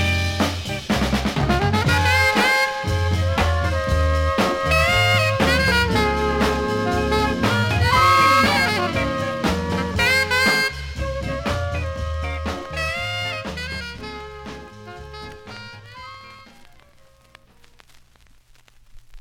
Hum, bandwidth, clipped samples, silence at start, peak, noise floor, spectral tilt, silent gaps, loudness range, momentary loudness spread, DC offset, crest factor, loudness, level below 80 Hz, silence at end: none; 17 kHz; under 0.1%; 0 s; -6 dBFS; -52 dBFS; -4.5 dB/octave; none; 17 LU; 21 LU; under 0.1%; 16 dB; -19 LUFS; -32 dBFS; 0 s